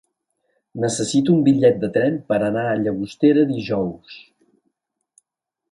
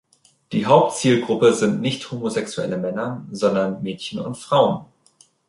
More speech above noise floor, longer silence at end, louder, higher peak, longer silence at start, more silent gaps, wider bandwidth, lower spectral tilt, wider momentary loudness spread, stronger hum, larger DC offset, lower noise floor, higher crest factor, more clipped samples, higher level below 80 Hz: first, 64 dB vs 37 dB; first, 1.55 s vs 0.65 s; about the same, -19 LUFS vs -21 LUFS; about the same, -4 dBFS vs -2 dBFS; first, 0.75 s vs 0.5 s; neither; about the same, 11.5 kHz vs 11.5 kHz; about the same, -6 dB/octave vs -5.5 dB/octave; second, 9 LU vs 12 LU; neither; neither; first, -83 dBFS vs -57 dBFS; about the same, 18 dB vs 18 dB; neither; about the same, -58 dBFS vs -62 dBFS